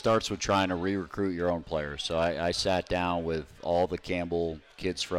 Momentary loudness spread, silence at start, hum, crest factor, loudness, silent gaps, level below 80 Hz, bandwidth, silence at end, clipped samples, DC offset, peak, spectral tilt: 7 LU; 0 s; none; 14 dB; -30 LUFS; none; -52 dBFS; 15 kHz; 0 s; under 0.1%; under 0.1%; -16 dBFS; -4.5 dB/octave